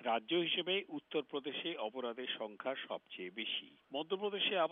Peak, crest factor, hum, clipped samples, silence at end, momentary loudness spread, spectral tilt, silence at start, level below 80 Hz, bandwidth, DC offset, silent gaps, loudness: -22 dBFS; 16 dB; none; under 0.1%; 0 s; 10 LU; -1 dB/octave; 0 s; under -90 dBFS; 4 kHz; under 0.1%; none; -39 LUFS